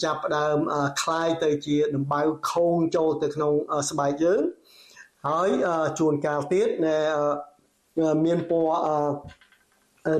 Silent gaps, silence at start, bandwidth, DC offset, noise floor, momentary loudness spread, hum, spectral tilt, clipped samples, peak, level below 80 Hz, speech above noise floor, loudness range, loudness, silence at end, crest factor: none; 0 s; 13 kHz; under 0.1%; -64 dBFS; 4 LU; none; -5.5 dB/octave; under 0.1%; -14 dBFS; -64 dBFS; 40 dB; 1 LU; -24 LUFS; 0 s; 12 dB